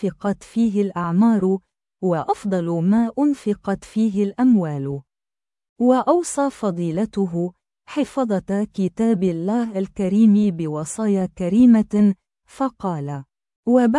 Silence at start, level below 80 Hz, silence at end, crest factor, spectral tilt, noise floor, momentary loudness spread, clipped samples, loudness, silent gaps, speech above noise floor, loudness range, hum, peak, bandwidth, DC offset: 0 s; -54 dBFS; 0 s; 16 dB; -7.5 dB/octave; under -90 dBFS; 11 LU; under 0.1%; -20 LUFS; 5.69-5.76 s, 13.56-13.63 s; over 71 dB; 4 LU; none; -4 dBFS; 11.5 kHz; under 0.1%